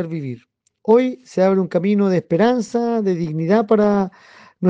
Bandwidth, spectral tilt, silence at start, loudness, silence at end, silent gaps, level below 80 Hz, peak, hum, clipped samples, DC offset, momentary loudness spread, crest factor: 8 kHz; -8 dB/octave; 0 s; -18 LUFS; 0 s; none; -60 dBFS; -4 dBFS; none; under 0.1%; under 0.1%; 11 LU; 14 dB